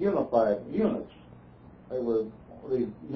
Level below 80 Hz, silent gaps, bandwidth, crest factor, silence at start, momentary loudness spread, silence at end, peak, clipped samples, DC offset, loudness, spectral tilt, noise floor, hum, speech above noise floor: -58 dBFS; none; 5.4 kHz; 18 dB; 0 s; 13 LU; 0 s; -10 dBFS; under 0.1%; under 0.1%; -29 LUFS; -10 dB/octave; -51 dBFS; none; 23 dB